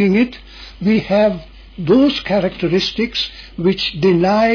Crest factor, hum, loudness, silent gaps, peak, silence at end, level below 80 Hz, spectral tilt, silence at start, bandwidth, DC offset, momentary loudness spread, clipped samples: 12 dB; none; -16 LUFS; none; -4 dBFS; 0 s; -40 dBFS; -6.5 dB/octave; 0 s; 5.4 kHz; under 0.1%; 10 LU; under 0.1%